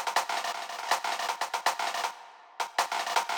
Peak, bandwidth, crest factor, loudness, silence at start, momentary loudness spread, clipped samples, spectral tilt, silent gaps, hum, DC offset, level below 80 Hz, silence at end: -12 dBFS; over 20 kHz; 18 dB; -31 LUFS; 0 s; 7 LU; under 0.1%; 1.5 dB/octave; none; none; under 0.1%; -80 dBFS; 0 s